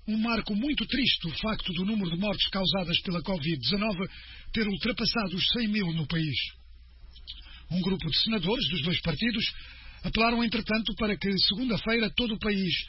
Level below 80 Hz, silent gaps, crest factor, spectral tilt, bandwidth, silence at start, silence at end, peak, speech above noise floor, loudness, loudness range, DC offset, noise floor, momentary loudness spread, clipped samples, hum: -44 dBFS; none; 20 dB; -7.5 dB/octave; 6 kHz; 0.05 s; 0 s; -10 dBFS; 21 dB; -28 LUFS; 2 LU; under 0.1%; -49 dBFS; 9 LU; under 0.1%; none